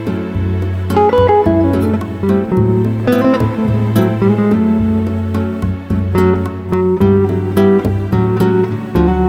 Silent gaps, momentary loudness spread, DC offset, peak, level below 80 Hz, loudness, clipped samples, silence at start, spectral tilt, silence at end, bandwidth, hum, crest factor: none; 7 LU; under 0.1%; 0 dBFS; -30 dBFS; -14 LUFS; under 0.1%; 0 s; -9 dB/octave; 0 s; 16 kHz; none; 12 dB